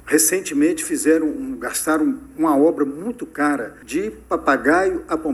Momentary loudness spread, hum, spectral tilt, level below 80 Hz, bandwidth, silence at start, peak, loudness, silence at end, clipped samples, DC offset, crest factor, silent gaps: 9 LU; none; -3 dB/octave; -50 dBFS; 15.5 kHz; 0.05 s; -2 dBFS; -20 LUFS; 0 s; under 0.1%; under 0.1%; 18 dB; none